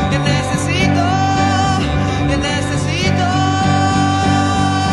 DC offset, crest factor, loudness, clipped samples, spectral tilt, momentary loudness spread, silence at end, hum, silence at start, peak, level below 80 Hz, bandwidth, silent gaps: under 0.1%; 12 dB; -15 LUFS; under 0.1%; -5 dB/octave; 3 LU; 0 s; none; 0 s; -2 dBFS; -32 dBFS; 12 kHz; none